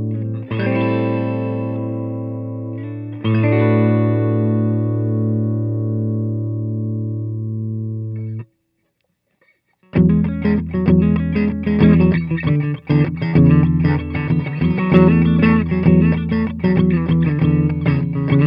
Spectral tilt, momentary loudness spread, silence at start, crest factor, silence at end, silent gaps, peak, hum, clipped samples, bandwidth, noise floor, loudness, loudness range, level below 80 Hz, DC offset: -11.5 dB/octave; 11 LU; 0 s; 16 dB; 0 s; none; 0 dBFS; none; under 0.1%; 5.2 kHz; -69 dBFS; -17 LUFS; 8 LU; -36 dBFS; under 0.1%